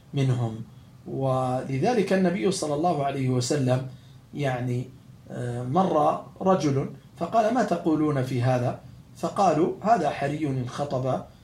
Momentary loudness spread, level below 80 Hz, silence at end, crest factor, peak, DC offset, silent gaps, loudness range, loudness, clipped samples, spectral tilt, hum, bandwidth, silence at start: 12 LU; -60 dBFS; 0.15 s; 18 dB; -8 dBFS; under 0.1%; none; 3 LU; -25 LUFS; under 0.1%; -6.5 dB/octave; none; 12.5 kHz; 0.1 s